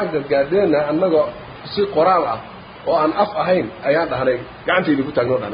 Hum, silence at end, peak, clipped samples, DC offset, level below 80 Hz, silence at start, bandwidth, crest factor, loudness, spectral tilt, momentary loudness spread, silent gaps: none; 0 s; -2 dBFS; under 0.1%; under 0.1%; -50 dBFS; 0 s; 5.2 kHz; 16 dB; -18 LUFS; -11 dB/octave; 8 LU; none